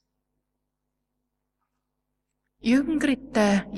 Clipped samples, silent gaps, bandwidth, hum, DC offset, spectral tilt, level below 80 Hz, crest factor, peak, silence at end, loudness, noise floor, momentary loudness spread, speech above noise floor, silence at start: under 0.1%; none; 12 kHz; 50 Hz at -65 dBFS; under 0.1%; -5.5 dB/octave; -56 dBFS; 18 dB; -10 dBFS; 0 s; -24 LUFS; -81 dBFS; 3 LU; 58 dB; 2.65 s